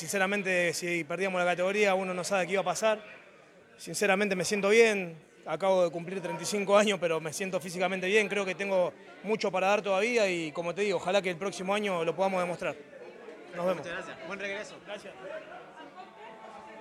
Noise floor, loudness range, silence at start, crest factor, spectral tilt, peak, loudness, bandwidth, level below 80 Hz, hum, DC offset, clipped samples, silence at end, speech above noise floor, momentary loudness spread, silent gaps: -56 dBFS; 9 LU; 0 s; 20 dB; -4 dB/octave; -10 dBFS; -29 LUFS; 15 kHz; -76 dBFS; none; under 0.1%; under 0.1%; 0 s; 27 dB; 21 LU; none